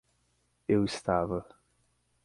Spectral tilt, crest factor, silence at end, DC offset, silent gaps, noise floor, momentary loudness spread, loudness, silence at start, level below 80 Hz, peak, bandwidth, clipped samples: -6.5 dB/octave; 20 dB; 0.8 s; under 0.1%; none; -73 dBFS; 10 LU; -30 LUFS; 0.7 s; -56 dBFS; -12 dBFS; 11.5 kHz; under 0.1%